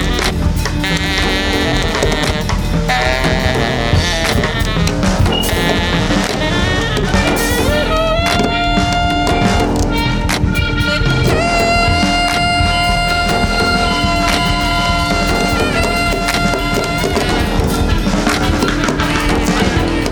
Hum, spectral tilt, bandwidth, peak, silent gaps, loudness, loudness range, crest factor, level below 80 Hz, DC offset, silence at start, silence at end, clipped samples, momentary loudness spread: none; -4.5 dB/octave; over 20 kHz; 0 dBFS; none; -14 LUFS; 2 LU; 14 dB; -22 dBFS; under 0.1%; 0 s; 0 s; under 0.1%; 3 LU